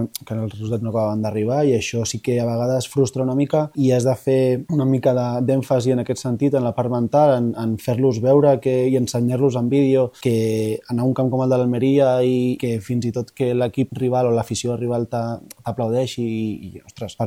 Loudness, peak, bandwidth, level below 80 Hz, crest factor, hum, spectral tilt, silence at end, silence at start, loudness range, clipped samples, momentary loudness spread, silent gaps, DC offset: -20 LUFS; -4 dBFS; 16 kHz; -56 dBFS; 16 dB; none; -7 dB/octave; 0 s; 0 s; 4 LU; under 0.1%; 9 LU; none; under 0.1%